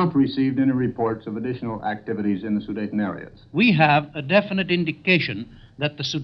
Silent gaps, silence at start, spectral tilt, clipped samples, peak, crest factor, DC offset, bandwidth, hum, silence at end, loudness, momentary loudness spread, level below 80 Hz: none; 0 s; -6.5 dB/octave; under 0.1%; -2 dBFS; 20 dB; under 0.1%; 6.2 kHz; none; 0 s; -22 LUFS; 10 LU; -56 dBFS